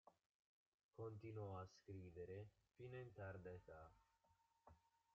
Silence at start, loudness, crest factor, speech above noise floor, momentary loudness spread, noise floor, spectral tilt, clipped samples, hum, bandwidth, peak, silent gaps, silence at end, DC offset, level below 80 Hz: 0.05 s; -58 LUFS; 16 dB; 26 dB; 10 LU; -83 dBFS; -7 dB/octave; under 0.1%; none; 7.2 kHz; -44 dBFS; 0.26-0.78 s, 0.84-0.89 s; 0.35 s; under 0.1%; -82 dBFS